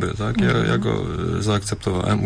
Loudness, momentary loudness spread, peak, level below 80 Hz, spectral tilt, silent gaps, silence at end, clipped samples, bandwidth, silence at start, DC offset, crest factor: -21 LUFS; 5 LU; -10 dBFS; -38 dBFS; -6 dB/octave; none; 0 s; under 0.1%; 11 kHz; 0 s; under 0.1%; 10 dB